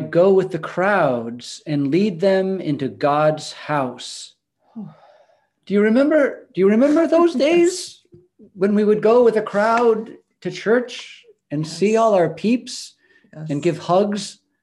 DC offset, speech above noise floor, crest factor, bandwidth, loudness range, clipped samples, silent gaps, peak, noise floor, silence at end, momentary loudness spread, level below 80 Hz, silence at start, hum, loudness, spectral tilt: under 0.1%; 40 dB; 14 dB; 12 kHz; 5 LU; under 0.1%; none; -4 dBFS; -58 dBFS; 0.3 s; 17 LU; -68 dBFS; 0 s; none; -18 LUFS; -6 dB/octave